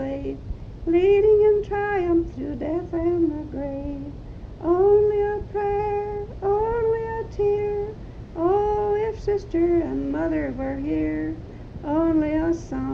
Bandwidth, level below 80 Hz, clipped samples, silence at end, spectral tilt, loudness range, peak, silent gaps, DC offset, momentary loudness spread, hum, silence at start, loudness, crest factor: 6.8 kHz; -38 dBFS; under 0.1%; 0 s; -8.5 dB/octave; 4 LU; -8 dBFS; none; under 0.1%; 15 LU; none; 0 s; -23 LUFS; 14 dB